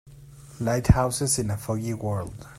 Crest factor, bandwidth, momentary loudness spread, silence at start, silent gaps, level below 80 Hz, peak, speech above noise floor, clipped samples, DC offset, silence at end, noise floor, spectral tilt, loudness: 22 dB; 15.5 kHz; 9 LU; 0.05 s; none; -38 dBFS; -4 dBFS; 22 dB; under 0.1%; under 0.1%; 0 s; -46 dBFS; -5.5 dB/octave; -25 LUFS